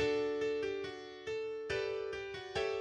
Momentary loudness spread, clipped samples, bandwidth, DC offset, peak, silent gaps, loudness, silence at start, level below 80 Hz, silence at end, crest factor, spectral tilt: 8 LU; under 0.1%; 9.4 kHz; under 0.1%; -22 dBFS; none; -38 LUFS; 0 s; -64 dBFS; 0 s; 14 dB; -4.5 dB/octave